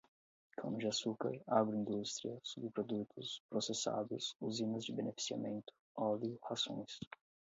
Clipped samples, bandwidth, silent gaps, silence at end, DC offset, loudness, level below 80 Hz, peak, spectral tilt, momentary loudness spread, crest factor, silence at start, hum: under 0.1%; 7.6 kHz; 3.40-3.49 s, 5.80-5.95 s, 7.07-7.11 s; 0.3 s; under 0.1%; -41 LUFS; -82 dBFS; -20 dBFS; -4.5 dB/octave; 10 LU; 22 dB; 0.6 s; none